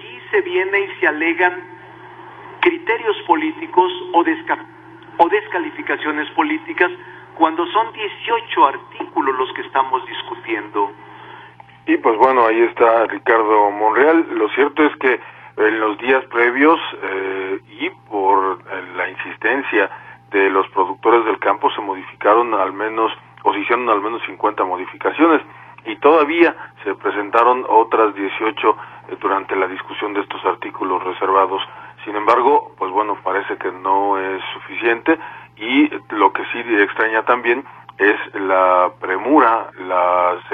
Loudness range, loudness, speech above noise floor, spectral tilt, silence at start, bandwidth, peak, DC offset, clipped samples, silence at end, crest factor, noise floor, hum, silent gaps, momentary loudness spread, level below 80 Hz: 4 LU; -17 LUFS; 25 dB; -6.5 dB/octave; 0 s; 5.4 kHz; 0 dBFS; under 0.1%; under 0.1%; 0 s; 18 dB; -42 dBFS; none; none; 11 LU; -64 dBFS